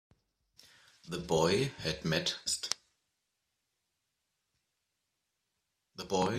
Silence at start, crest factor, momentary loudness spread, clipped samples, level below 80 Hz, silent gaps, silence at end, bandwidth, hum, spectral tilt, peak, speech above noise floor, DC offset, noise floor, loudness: 1.05 s; 26 dB; 14 LU; under 0.1%; -64 dBFS; none; 0 s; 15.5 kHz; none; -3.5 dB/octave; -10 dBFS; 52 dB; under 0.1%; -84 dBFS; -33 LUFS